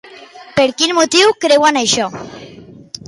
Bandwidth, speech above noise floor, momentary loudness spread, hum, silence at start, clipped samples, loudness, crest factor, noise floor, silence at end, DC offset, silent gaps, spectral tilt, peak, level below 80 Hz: 11.5 kHz; 24 dB; 19 LU; none; 0.1 s; under 0.1%; -13 LUFS; 14 dB; -37 dBFS; 0.35 s; under 0.1%; none; -2 dB/octave; 0 dBFS; -54 dBFS